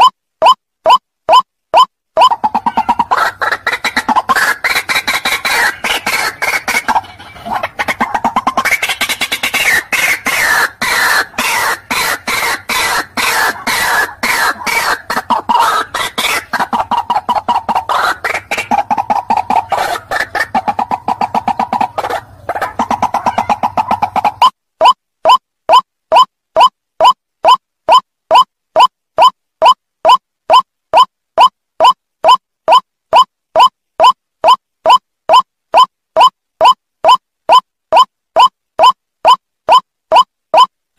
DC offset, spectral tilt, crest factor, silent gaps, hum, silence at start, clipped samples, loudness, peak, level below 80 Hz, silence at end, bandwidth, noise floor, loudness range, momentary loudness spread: under 0.1%; -1.5 dB/octave; 12 dB; none; none; 0 s; under 0.1%; -12 LUFS; 0 dBFS; -48 dBFS; 0.3 s; 16 kHz; -29 dBFS; 4 LU; 5 LU